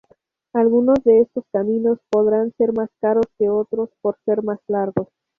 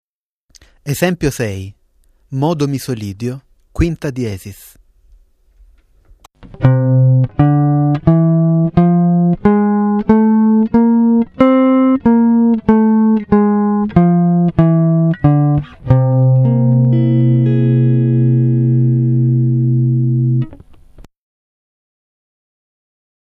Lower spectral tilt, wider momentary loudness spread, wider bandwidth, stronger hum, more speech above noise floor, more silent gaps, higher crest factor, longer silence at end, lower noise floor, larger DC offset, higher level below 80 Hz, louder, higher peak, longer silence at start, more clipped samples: about the same, -9.5 dB/octave vs -9 dB/octave; about the same, 9 LU vs 10 LU; second, 5.2 kHz vs 13.5 kHz; neither; about the same, 41 dB vs 44 dB; neither; about the same, 16 dB vs 12 dB; second, 0.35 s vs 2.2 s; about the same, -59 dBFS vs -61 dBFS; neither; second, -56 dBFS vs -38 dBFS; second, -19 LUFS vs -13 LUFS; second, -4 dBFS vs 0 dBFS; second, 0.55 s vs 0.85 s; neither